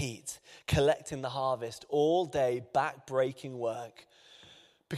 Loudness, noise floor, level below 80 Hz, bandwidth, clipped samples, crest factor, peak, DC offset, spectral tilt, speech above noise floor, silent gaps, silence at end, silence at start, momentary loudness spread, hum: -32 LUFS; -59 dBFS; -56 dBFS; 14.5 kHz; under 0.1%; 18 dB; -14 dBFS; under 0.1%; -5 dB/octave; 27 dB; none; 0 s; 0 s; 14 LU; none